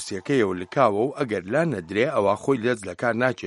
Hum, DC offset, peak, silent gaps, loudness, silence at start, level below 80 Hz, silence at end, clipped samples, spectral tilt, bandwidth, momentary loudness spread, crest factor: none; under 0.1%; -4 dBFS; none; -23 LUFS; 0 s; -64 dBFS; 0 s; under 0.1%; -6 dB/octave; 11.5 kHz; 5 LU; 18 dB